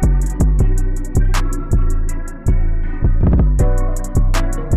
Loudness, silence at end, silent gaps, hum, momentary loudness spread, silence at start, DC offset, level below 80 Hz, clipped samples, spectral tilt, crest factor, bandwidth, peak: -19 LUFS; 0 s; none; none; 7 LU; 0 s; under 0.1%; -14 dBFS; under 0.1%; -7 dB/octave; 8 dB; 12 kHz; -4 dBFS